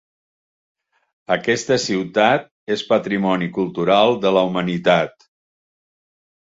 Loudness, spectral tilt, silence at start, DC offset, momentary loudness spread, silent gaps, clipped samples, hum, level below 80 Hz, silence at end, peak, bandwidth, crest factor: -18 LUFS; -5 dB/octave; 1.3 s; under 0.1%; 8 LU; 2.51-2.67 s; under 0.1%; none; -60 dBFS; 1.5 s; -2 dBFS; 8 kHz; 18 dB